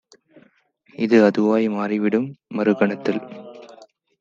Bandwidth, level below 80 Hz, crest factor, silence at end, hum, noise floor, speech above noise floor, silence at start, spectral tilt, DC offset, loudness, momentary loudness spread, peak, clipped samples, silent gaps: 7.4 kHz; -72 dBFS; 18 dB; 0.55 s; none; -59 dBFS; 39 dB; 1 s; -7.5 dB/octave; under 0.1%; -20 LUFS; 16 LU; -2 dBFS; under 0.1%; none